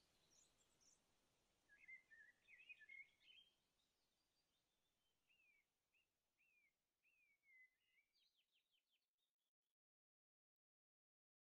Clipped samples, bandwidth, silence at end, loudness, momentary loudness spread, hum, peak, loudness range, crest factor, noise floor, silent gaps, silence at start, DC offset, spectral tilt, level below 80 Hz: under 0.1%; 7.4 kHz; 1.9 s; -65 LUFS; 8 LU; none; -54 dBFS; 2 LU; 22 dB; under -90 dBFS; 9.08-9.18 s, 9.31-9.39 s; 0 s; under 0.1%; 1.5 dB/octave; under -90 dBFS